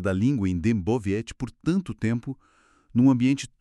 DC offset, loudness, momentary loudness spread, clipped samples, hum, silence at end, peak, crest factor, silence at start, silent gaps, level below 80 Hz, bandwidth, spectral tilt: under 0.1%; -25 LUFS; 11 LU; under 0.1%; none; 0.15 s; -8 dBFS; 16 dB; 0 s; none; -50 dBFS; 11 kHz; -7.5 dB/octave